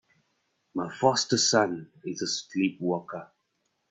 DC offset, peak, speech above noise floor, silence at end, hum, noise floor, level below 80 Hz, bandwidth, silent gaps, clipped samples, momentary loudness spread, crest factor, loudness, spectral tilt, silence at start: under 0.1%; -6 dBFS; 49 dB; 0.65 s; none; -76 dBFS; -72 dBFS; 8.8 kHz; none; under 0.1%; 15 LU; 22 dB; -27 LUFS; -3 dB/octave; 0.75 s